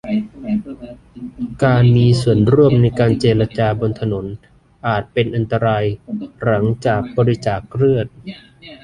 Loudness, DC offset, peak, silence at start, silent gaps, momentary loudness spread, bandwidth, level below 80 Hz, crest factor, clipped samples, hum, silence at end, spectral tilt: -16 LUFS; under 0.1%; -2 dBFS; 0.05 s; none; 21 LU; 10.5 kHz; -42 dBFS; 14 dB; under 0.1%; none; 0.05 s; -8 dB/octave